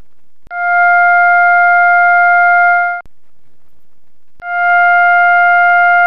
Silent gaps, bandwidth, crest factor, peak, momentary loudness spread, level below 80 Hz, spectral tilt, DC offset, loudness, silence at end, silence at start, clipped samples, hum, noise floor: none; 5.4 kHz; 8 dB; -4 dBFS; 10 LU; -54 dBFS; -4 dB/octave; 3%; -8 LUFS; 0 s; 0.45 s; under 0.1%; none; -64 dBFS